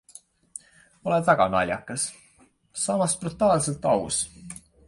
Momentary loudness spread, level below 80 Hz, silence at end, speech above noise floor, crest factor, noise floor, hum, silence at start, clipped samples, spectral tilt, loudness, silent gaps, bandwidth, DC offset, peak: 21 LU; -54 dBFS; 0.35 s; 36 dB; 22 dB; -60 dBFS; none; 1.05 s; under 0.1%; -4 dB/octave; -24 LUFS; none; 11.5 kHz; under 0.1%; -4 dBFS